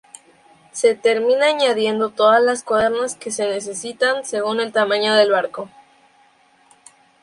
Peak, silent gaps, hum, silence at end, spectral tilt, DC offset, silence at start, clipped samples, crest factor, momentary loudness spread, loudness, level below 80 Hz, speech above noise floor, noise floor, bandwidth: -2 dBFS; none; none; 1.55 s; -2.5 dB/octave; under 0.1%; 0.75 s; under 0.1%; 16 dB; 10 LU; -18 LUFS; -62 dBFS; 37 dB; -55 dBFS; 11.5 kHz